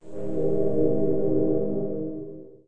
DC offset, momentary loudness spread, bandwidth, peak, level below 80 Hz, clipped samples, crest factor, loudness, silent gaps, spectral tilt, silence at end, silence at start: under 0.1%; 10 LU; 2.7 kHz; -10 dBFS; -50 dBFS; under 0.1%; 16 dB; -26 LUFS; none; -11.5 dB/octave; 0 s; 0 s